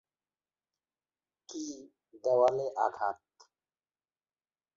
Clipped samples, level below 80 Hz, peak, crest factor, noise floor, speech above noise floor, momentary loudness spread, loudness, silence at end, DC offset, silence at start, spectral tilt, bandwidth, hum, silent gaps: under 0.1%; -80 dBFS; -14 dBFS; 22 dB; under -90 dBFS; over 61 dB; 19 LU; -31 LUFS; 1.6 s; under 0.1%; 1.5 s; -4.5 dB/octave; 7.6 kHz; none; none